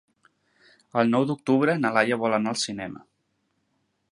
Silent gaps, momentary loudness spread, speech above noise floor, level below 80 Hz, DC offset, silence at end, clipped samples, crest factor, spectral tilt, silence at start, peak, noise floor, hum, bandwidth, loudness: none; 12 LU; 50 dB; -70 dBFS; under 0.1%; 1.15 s; under 0.1%; 22 dB; -5 dB/octave; 0.95 s; -4 dBFS; -73 dBFS; none; 11.5 kHz; -24 LUFS